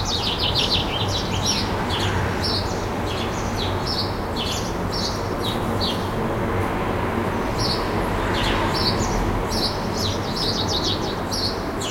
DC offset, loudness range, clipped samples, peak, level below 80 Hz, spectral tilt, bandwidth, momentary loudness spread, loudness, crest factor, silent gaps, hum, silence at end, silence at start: under 0.1%; 2 LU; under 0.1%; -8 dBFS; -34 dBFS; -4.5 dB/octave; 16.5 kHz; 4 LU; -23 LUFS; 16 dB; none; none; 0 s; 0 s